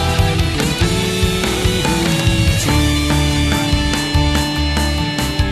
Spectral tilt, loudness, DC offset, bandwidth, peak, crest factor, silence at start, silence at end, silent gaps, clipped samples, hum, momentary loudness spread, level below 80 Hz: -4.5 dB/octave; -16 LUFS; under 0.1%; 14 kHz; -2 dBFS; 12 dB; 0 s; 0 s; none; under 0.1%; none; 2 LU; -22 dBFS